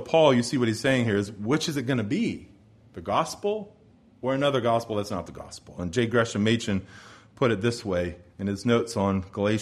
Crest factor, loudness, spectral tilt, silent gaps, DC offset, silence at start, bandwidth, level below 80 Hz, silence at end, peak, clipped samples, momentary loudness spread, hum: 20 dB; -26 LUFS; -5.5 dB/octave; none; under 0.1%; 0 s; 13.5 kHz; -56 dBFS; 0 s; -6 dBFS; under 0.1%; 12 LU; none